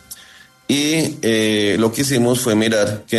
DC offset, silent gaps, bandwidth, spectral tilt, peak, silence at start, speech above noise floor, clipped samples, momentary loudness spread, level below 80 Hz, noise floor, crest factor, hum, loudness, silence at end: under 0.1%; none; 13.5 kHz; -4 dB/octave; -4 dBFS; 0.1 s; 29 dB; under 0.1%; 11 LU; -54 dBFS; -45 dBFS; 14 dB; none; -17 LUFS; 0 s